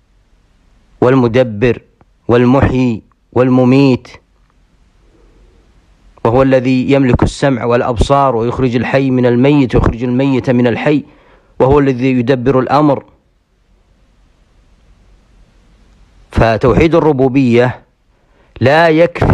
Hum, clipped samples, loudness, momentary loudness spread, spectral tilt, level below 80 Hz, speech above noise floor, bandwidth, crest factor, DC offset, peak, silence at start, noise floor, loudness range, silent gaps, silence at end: none; under 0.1%; -11 LUFS; 6 LU; -8 dB/octave; -30 dBFS; 45 dB; 9.8 kHz; 12 dB; under 0.1%; 0 dBFS; 1 s; -55 dBFS; 5 LU; none; 0 s